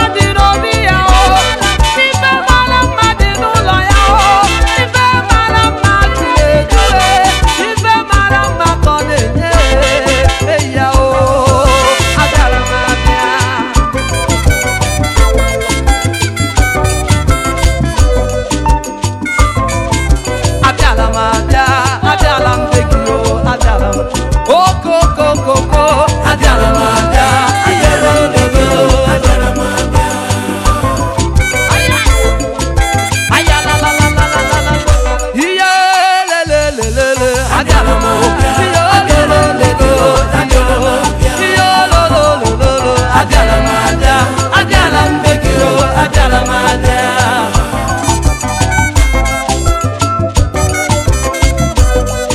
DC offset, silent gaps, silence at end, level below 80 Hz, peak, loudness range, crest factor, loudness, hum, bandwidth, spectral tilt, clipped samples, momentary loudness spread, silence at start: under 0.1%; none; 0 s; -16 dBFS; 0 dBFS; 3 LU; 10 dB; -10 LUFS; none; 15 kHz; -4.5 dB/octave; 1%; 5 LU; 0 s